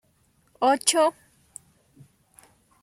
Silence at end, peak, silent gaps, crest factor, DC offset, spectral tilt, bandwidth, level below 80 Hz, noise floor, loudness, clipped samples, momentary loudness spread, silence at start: 1.7 s; -4 dBFS; none; 24 dB; under 0.1%; -1 dB/octave; 16 kHz; -72 dBFS; -65 dBFS; -22 LUFS; under 0.1%; 26 LU; 0.6 s